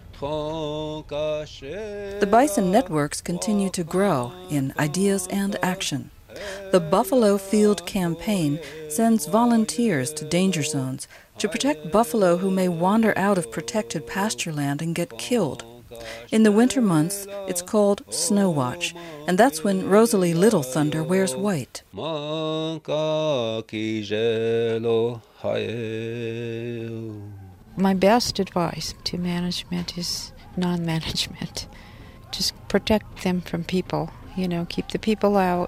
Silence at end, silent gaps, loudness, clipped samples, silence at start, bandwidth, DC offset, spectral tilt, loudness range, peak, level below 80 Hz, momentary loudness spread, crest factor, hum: 0 s; none; -23 LUFS; under 0.1%; 0 s; 15.5 kHz; under 0.1%; -5 dB/octave; 5 LU; -4 dBFS; -50 dBFS; 12 LU; 20 dB; none